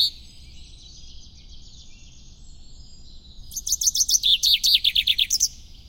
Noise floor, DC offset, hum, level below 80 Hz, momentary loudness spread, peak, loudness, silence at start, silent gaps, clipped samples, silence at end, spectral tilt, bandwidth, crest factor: -44 dBFS; under 0.1%; none; -46 dBFS; 9 LU; -4 dBFS; -18 LUFS; 0 s; none; under 0.1%; 0.2 s; 3 dB/octave; 17 kHz; 22 dB